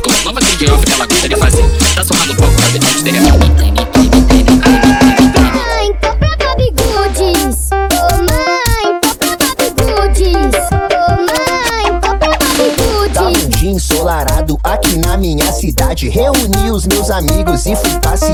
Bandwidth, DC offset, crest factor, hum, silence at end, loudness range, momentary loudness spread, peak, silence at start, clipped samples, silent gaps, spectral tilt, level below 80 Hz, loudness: 19.5 kHz; under 0.1%; 10 dB; none; 0 s; 4 LU; 5 LU; 0 dBFS; 0 s; under 0.1%; none; -4 dB/octave; -16 dBFS; -11 LUFS